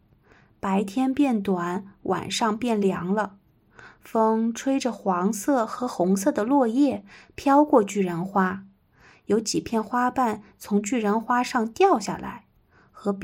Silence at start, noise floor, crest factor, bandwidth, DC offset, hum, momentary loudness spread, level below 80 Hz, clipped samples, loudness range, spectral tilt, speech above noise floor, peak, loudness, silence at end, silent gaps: 0.65 s; -59 dBFS; 18 dB; 16.5 kHz; under 0.1%; none; 11 LU; -62 dBFS; under 0.1%; 3 LU; -5.5 dB/octave; 36 dB; -6 dBFS; -24 LUFS; 0 s; none